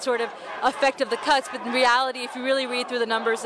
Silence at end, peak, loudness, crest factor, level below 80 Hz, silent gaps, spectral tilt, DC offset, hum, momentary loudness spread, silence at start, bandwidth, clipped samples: 0 s; -8 dBFS; -23 LUFS; 16 dB; -66 dBFS; none; -1.5 dB/octave; under 0.1%; none; 7 LU; 0 s; 11 kHz; under 0.1%